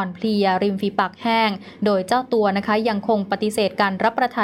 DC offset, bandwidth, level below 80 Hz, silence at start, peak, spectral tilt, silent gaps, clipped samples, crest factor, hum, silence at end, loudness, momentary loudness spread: under 0.1%; 15 kHz; -64 dBFS; 0 s; -6 dBFS; -5.5 dB/octave; none; under 0.1%; 14 dB; none; 0 s; -20 LUFS; 3 LU